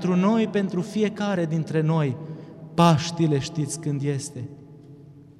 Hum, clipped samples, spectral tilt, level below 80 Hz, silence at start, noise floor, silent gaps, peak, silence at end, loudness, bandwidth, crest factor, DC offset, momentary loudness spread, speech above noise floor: none; under 0.1%; -6.5 dB/octave; -60 dBFS; 0 s; -46 dBFS; none; -4 dBFS; 0.15 s; -24 LUFS; 12.5 kHz; 20 dB; under 0.1%; 15 LU; 23 dB